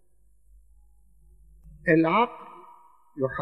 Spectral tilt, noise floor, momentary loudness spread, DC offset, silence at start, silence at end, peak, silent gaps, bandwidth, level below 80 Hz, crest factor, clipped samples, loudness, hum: -8.5 dB/octave; -64 dBFS; 26 LU; 0.1%; 1.65 s; 0 s; -8 dBFS; none; 5.2 kHz; -56 dBFS; 22 dB; under 0.1%; -24 LUFS; none